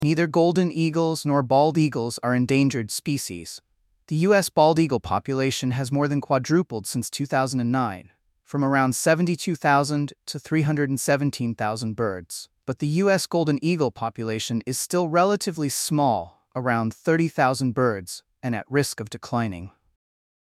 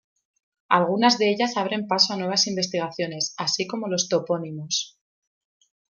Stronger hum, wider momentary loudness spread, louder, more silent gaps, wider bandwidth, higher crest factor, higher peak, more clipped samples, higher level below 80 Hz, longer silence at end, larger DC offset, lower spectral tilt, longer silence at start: neither; about the same, 10 LU vs 8 LU; about the same, -23 LUFS vs -23 LUFS; neither; first, 16 kHz vs 11 kHz; about the same, 18 dB vs 22 dB; about the same, -6 dBFS vs -4 dBFS; neither; first, -60 dBFS vs -74 dBFS; second, 0.8 s vs 1.1 s; neither; first, -5.5 dB/octave vs -3 dB/octave; second, 0 s vs 0.7 s